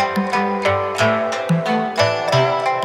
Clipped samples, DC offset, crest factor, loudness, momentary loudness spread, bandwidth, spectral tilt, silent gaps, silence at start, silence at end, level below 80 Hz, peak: under 0.1%; under 0.1%; 16 dB; -18 LUFS; 3 LU; 16 kHz; -5.5 dB/octave; none; 0 s; 0 s; -60 dBFS; -2 dBFS